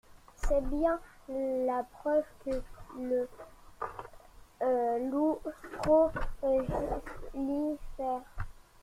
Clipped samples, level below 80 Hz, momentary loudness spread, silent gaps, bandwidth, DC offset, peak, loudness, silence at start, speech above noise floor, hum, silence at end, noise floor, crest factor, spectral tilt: under 0.1%; -44 dBFS; 14 LU; none; 15.5 kHz; under 0.1%; -16 dBFS; -33 LUFS; 0.1 s; 22 dB; none; 0.25 s; -54 dBFS; 18 dB; -7 dB/octave